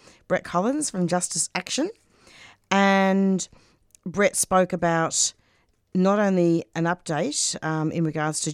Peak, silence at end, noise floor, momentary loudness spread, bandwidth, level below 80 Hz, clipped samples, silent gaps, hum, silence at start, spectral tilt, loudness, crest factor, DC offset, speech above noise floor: -4 dBFS; 0 s; -65 dBFS; 8 LU; 15.5 kHz; -60 dBFS; under 0.1%; none; none; 0.3 s; -4 dB/octave; -23 LUFS; 20 dB; under 0.1%; 42 dB